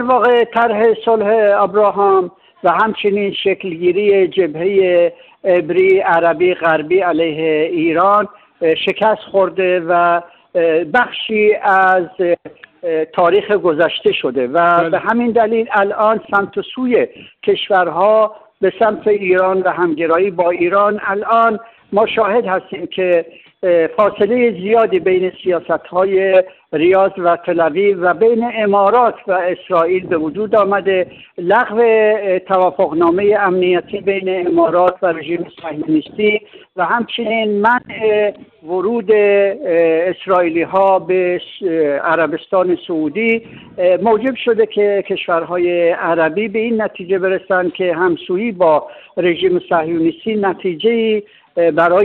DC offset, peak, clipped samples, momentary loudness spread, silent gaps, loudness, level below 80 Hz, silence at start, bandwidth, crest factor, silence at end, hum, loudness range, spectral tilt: under 0.1%; -4 dBFS; under 0.1%; 7 LU; none; -14 LUFS; -58 dBFS; 0 s; 4.4 kHz; 10 dB; 0 s; none; 2 LU; -8 dB/octave